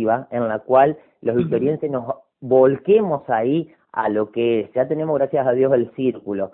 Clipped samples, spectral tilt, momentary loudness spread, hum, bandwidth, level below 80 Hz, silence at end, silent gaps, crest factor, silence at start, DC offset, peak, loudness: under 0.1%; -12 dB/octave; 9 LU; none; 3.9 kHz; -62 dBFS; 0.05 s; none; 16 dB; 0 s; under 0.1%; -2 dBFS; -20 LUFS